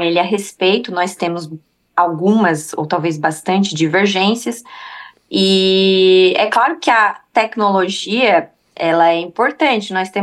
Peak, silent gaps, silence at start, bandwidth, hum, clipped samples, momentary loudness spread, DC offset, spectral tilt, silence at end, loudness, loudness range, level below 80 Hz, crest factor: -2 dBFS; none; 0 s; 12.5 kHz; none; under 0.1%; 10 LU; under 0.1%; -4.5 dB/octave; 0 s; -15 LUFS; 4 LU; -68 dBFS; 14 dB